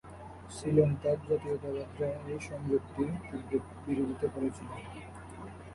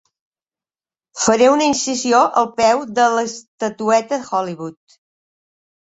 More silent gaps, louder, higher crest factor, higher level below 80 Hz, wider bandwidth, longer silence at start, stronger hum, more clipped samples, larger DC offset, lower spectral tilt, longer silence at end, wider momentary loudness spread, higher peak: second, none vs 3.48-3.58 s; second, -33 LUFS vs -17 LUFS; first, 22 dB vs 16 dB; first, -54 dBFS vs -60 dBFS; first, 11.5 kHz vs 8.4 kHz; second, 0.05 s vs 1.15 s; neither; neither; neither; first, -7.5 dB/octave vs -3 dB/octave; second, 0 s vs 1.25 s; first, 18 LU vs 13 LU; second, -12 dBFS vs -2 dBFS